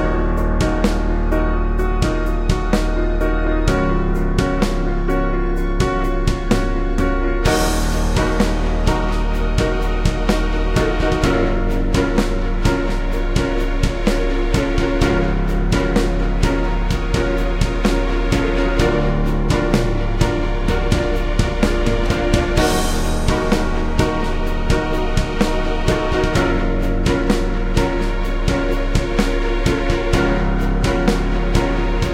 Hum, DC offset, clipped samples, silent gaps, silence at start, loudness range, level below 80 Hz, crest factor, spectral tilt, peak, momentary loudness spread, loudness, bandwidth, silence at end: none; under 0.1%; under 0.1%; none; 0 s; 1 LU; -20 dBFS; 16 dB; -6 dB/octave; 0 dBFS; 3 LU; -19 LUFS; 14.5 kHz; 0 s